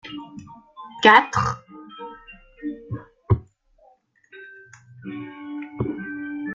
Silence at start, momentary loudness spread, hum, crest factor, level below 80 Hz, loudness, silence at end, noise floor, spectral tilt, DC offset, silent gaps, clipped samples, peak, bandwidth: 0.05 s; 28 LU; none; 24 dB; -50 dBFS; -20 LUFS; 0 s; -58 dBFS; -5.5 dB/octave; under 0.1%; none; under 0.1%; -2 dBFS; 7.8 kHz